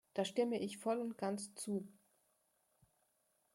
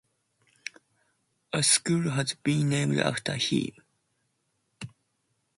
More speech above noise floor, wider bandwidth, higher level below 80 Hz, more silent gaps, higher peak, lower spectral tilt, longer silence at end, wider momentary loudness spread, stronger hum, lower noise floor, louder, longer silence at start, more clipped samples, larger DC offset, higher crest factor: second, 40 dB vs 49 dB; first, 16.5 kHz vs 11.5 kHz; second, -86 dBFS vs -66 dBFS; neither; second, -24 dBFS vs -8 dBFS; about the same, -4.5 dB/octave vs -3.5 dB/octave; first, 1.65 s vs 0.7 s; second, 7 LU vs 22 LU; neither; first, -80 dBFS vs -76 dBFS; second, -41 LUFS vs -26 LUFS; second, 0.15 s vs 1.55 s; neither; neither; about the same, 18 dB vs 22 dB